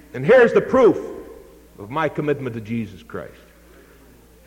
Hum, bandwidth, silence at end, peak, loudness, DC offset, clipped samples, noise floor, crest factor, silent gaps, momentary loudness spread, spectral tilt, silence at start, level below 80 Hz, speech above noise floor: none; 16 kHz; 1.2 s; -4 dBFS; -18 LUFS; under 0.1%; under 0.1%; -49 dBFS; 16 dB; none; 22 LU; -7 dB/octave; 0.15 s; -50 dBFS; 30 dB